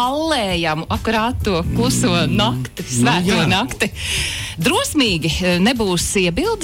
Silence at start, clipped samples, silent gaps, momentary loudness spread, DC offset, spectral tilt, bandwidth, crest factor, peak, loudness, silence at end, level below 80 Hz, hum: 0 s; under 0.1%; none; 4 LU; under 0.1%; -4 dB/octave; 16.5 kHz; 10 dB; -6 dBFS; -17 LUFS; 0 s; -34 dBFS; none